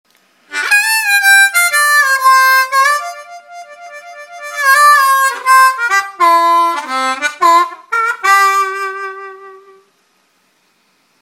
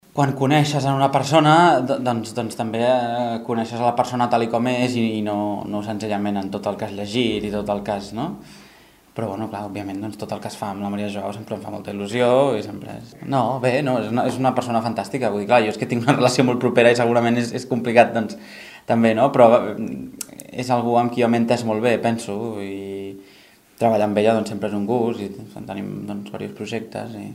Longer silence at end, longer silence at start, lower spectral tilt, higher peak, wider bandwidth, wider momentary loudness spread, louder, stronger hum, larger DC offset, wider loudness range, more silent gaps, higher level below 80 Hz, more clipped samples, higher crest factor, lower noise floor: first, 1.65 s vs 0 s; first, 0.5 s vs 0.15 s; second, 2.5 dB/octave vs -6 dB/octave; about the same, 0 dBFS vs 0 dBFS; about the same, 17 kHz vs 16 kHz; first, 20 LU vs 15 LU; first, -10 LUFS vs -20 LUFS; neither; neither; second, 5 LU vs 8 LU; neither; second, -76 dBFS vs -58 dBFS; neither; second, 12 dB vs 20 dB; first, -57 dBFS vs -50 dBFS